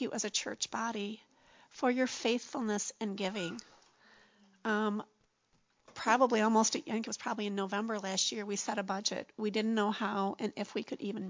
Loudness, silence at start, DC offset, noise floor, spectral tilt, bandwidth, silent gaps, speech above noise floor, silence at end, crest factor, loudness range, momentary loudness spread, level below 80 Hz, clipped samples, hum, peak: -34 LUFS; 0 s; under 0.1%; -74 dBFS; -3 dB/octave; 7.6 kHz; none; 40 dB; 0 s; 22 dB; 5 LU; 11 LU; -82 dBFS; under 0.1%; none; -12 dBFS